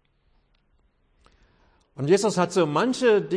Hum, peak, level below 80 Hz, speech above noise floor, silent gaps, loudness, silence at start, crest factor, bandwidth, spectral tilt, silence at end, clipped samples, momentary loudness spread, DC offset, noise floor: none; -8 dBFS; -64 dBFS; 44 dB; none; -22 LUFS; 2 s; 16 dB; 10.5 kHz; -5.5 dB/octave; 0 s; under 0.1%; 2 LU; under 0.1%; -65 dBFS